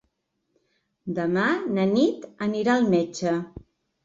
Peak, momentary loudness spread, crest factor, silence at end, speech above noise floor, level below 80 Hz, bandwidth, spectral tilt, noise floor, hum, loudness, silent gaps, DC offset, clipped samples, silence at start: -8 dBFS; 10 LU; 16 dB; 0.45 s; 52 dB; -60 dBFS; 7.8 kHz; -6 dB/octave; -75 dBFS; none; -24 LUFS; none; under 0.1%; under 0.1%; 1.05 s